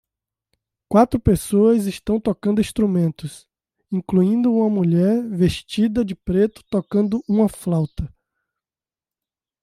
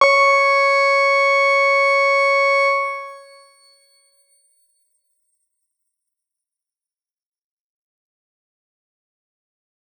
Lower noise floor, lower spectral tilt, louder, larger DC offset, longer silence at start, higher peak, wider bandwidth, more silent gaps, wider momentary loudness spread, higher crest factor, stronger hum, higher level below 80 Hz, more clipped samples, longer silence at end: about the same, under -90 dBFS vs under -90 dBFS; first, -7.5 dB/octave vs 2 dB/octave; second, -19 LUFS vs -14 LUFS; neither; first, 0.9 s vs 0 s; about the same, -4 dBFS vs -2 dBFS; first, 15 kHz vs 10.5 kHz; neither; about the same, 9 LU vs 8 LU; about the same, 18 dB vs 20 dB; neither; first, -42 dBFS vs under -90 dBFS; neither; second, 1.55 s vs 6.8 s